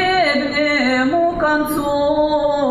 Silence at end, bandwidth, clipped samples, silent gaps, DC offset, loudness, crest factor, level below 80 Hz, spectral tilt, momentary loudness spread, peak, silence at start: 0 s; 13.5 kHz; under 0.1%; none; under 0.1%; -16 LUFS; 12 dB; -42 dBFS; -4.5 dB/octave; 2 LU; -6 dBFS; 0 s